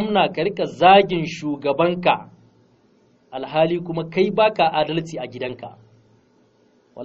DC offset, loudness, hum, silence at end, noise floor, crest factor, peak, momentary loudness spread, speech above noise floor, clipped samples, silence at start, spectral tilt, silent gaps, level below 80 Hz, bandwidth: under 0.1%; -19 LUFS; none; 0 s; -58 dBFS; 20 dB; 0 dBFS; 17 LU; 39 dB; under 0.1%; 0 s; -3.5 dB/octave; none; -58 dBFS; 7.6 kHz